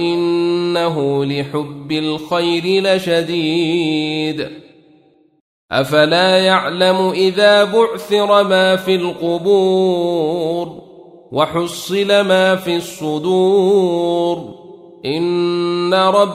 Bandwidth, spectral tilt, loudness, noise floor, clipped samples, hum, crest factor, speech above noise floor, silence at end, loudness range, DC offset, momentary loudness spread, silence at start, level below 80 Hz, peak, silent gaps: 15 kHz; -5 dB/octave; -15 LUFS; -52 dBFS; under 0.1%; none; 14 dB; 37 dB; 0 s; 4 LU; under 0.1%; 9 LU; 0 s; -58 dBFS; 0 dBFS; 5.41-5.68 s